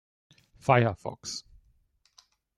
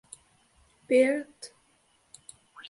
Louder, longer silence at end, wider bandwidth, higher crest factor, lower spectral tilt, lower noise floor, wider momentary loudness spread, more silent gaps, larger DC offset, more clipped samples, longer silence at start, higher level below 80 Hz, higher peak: second, -28 LUFS vs -25 LUFS; first, 1.2 s vs 0.1 s; about the same, 11.5 kHz vs 11.5 kHz; about the same, 24 dB vs 20 dB; first, -5.5 dB/octave vs -3.5 dB/octave; about the same, -68 dBFS vs -67 dBFS; second, 14 LU vs 27 LU; neither; neither; neither; second, 0.65 s vs 0.9 s; first, -62 dBFS vs -74 dBFS; first, -8 dBFS vs -12 dBFS